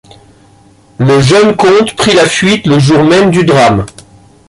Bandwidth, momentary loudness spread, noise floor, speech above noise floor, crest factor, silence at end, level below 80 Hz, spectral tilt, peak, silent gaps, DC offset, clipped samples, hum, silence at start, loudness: 11.5 kHz; 3 LU; -42 dBFS; 35 dB; 8 dB; 0.6 s; -38 dBFS; -5.5 dB/octave; 0 dBFS; none; under 0.1%; under 0.1%; none; 1 s; -7 LUFS